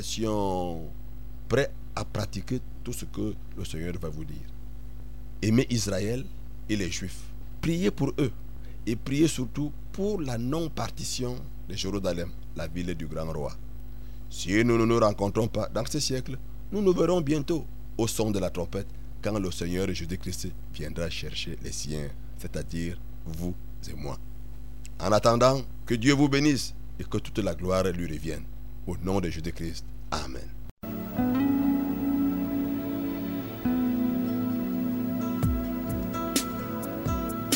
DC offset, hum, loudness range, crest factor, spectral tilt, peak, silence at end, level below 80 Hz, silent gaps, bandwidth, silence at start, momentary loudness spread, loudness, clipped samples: 2%; none; 9 LU; 22 dB; -5.5 dB/octave; -8 dBFS; 0 s; -42 dBFS; 30.71-30.77 s; over 20 kHz; 0 s; 17 LU; -29 LUFS; under 0.1%